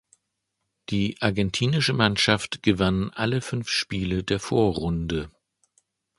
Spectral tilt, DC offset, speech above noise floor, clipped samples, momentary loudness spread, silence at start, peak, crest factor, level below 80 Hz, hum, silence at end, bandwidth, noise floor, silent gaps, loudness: -5 dB/octave; under 0.1%; 55 dB; under 0.1%; 8 LU; 0.9 s; -2 dBFS; 24 dB; -44 dBFS; none; 0.9 s; 11.5 kHz; -79 dBFS; none; -24 LUFS